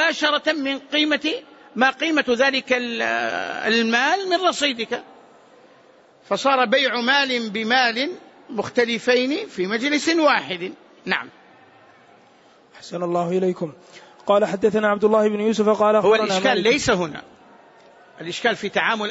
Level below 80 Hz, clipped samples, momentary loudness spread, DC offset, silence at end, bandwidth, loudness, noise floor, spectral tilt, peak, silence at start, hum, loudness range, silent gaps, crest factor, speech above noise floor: -62 dBFS; under 0.1%; 12 LU; under 0.1%; 0 s; 8 kHz; -20 LUFS; -53 dBFS; -3.5 dB/octave; -4 dBFS; 0 s; none; 6 LU; none; 16 dB; 32 dB